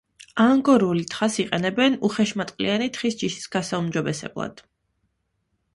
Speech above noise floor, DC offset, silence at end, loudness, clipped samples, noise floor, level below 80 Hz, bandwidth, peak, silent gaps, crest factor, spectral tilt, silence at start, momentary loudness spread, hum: 51 dB; under 0.1%; 1.2 s; -23 LUFS; under 0.1%; -73 dBFS; -60 dBFS; 11.5 kHz; -6 dBFS; none; 18 dB; -5 dB/octave; 0.35 s; 11 LU; none